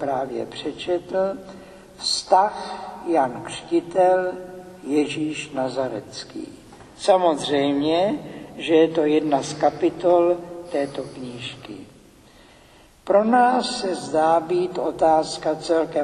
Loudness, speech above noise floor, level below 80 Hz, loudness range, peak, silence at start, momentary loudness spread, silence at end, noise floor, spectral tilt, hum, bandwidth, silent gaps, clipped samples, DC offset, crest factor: -22 LUFS; 30 dB; -58 dBFS; 4 LU; -4 dBFS; 0 s; 16 LU; 0 s; -51 dBFS; -4.5 dB/octave; none; 12 kHz; none; under 0.1%; under 0.1%; 18 dB